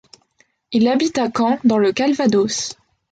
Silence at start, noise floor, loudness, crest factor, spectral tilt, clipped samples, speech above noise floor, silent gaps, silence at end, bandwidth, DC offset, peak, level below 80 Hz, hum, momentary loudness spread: 0.7 s; -61 dBFS; -18 LUFS; 14 dB; -4.5 dB/octave; under 0.1%; 44 dB; none; 0.4 s; 9.2 kHz; under 0.1%; -4 dBFS; -58 dBFS; none; 7 LU